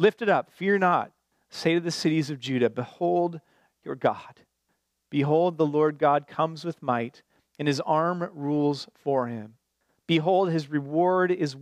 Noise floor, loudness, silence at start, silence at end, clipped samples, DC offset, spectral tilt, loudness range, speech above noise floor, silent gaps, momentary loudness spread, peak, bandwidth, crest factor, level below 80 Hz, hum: -76 dBFS; -26 LUFS; 0 s; 0 s; under 0.1%; under 0.1%; -6.5 dB/octave; 3 LU; 51 dB; none; 10 LU; -10 dBFS; 13.5 kHz; 16 dB; -78 dBFS; none